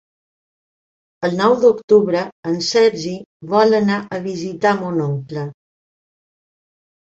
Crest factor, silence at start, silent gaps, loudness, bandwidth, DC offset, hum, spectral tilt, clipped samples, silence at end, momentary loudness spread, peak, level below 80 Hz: 18 dB; 1.2 s; 1.84-1.88 s, 2.32-2.43 s, 3.26-3.40 s; -17 LUFS; 8 kHz; under 0.1%; none; -5.5 dB/octave; under 0.1%; 1.5 s; 13 LU; -2 dBFS; -62 dBFS